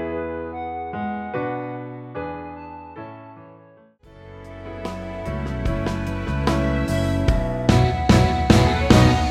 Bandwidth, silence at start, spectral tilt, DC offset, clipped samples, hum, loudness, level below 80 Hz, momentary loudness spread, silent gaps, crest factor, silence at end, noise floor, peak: 14.5 kHz; 0 s; -6.5 dB/octave; under 0.1%; under 0.1%; none; -21 LUFS; -30 dBFS; 20 LU; none; 20 dB; 0 s; -50 dBFS; 0 dBFS